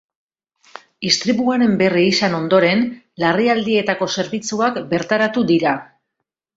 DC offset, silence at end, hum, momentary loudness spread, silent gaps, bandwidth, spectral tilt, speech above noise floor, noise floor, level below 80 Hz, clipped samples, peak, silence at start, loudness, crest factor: under 0.1%; 0.75 s; none; 7 LU; none; 8 kHz; -4.5 dB/octave; 62 dB; -79 dBFS; -58 dBFS; under 0.1%; -2 dBFS; 1 s; -17 LUFS; 16 dB